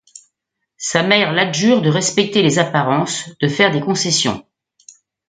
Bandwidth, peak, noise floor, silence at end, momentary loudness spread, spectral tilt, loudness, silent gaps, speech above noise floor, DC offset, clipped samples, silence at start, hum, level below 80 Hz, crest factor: 9.6 kHz; 0 dBFS; -76 dBFS; 0.9 s; 7 LU; -4 dB/octave; -16 LUFS; none; 60 dB; under 0.1%; under 0.1%; 0.8 s; none; -58 dBFS; 18 dB